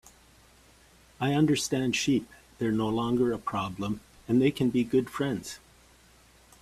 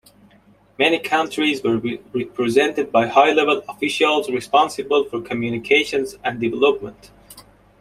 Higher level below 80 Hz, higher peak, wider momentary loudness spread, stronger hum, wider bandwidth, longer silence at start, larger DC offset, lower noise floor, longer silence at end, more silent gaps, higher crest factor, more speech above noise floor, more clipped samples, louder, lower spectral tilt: about the same, -58 dBFS vs -58 dBFS; second, -12 dBFS vs -2 dBFS; about the same, 10 LU vs 9 LU; neither; about the same, 14.5 kHz vs 15 kHz; first, 1.2 s vs 0.8 s; neither; first, -58 dBFS vs -53 dBFS; first, 1.05 s vs 0.4 s; neither; about the same, 18 dB vs 18 dB; about the same, 31 dB vs 34 dB; neither; second, -28 LUFS vs -19 LUFS; first, -5.5 dB/octave vs -4 dB/octave